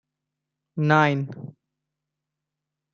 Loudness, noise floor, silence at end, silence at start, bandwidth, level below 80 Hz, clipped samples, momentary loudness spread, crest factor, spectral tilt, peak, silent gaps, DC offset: -21 LUFS; -85 dBFS; 1.45 s; 0.75 s; 7 kHz; -70 dBFS; under 0.1%; 22 LU; 24 dB; -7.5 dB/octave; -4 dBFS; none; under 0.1%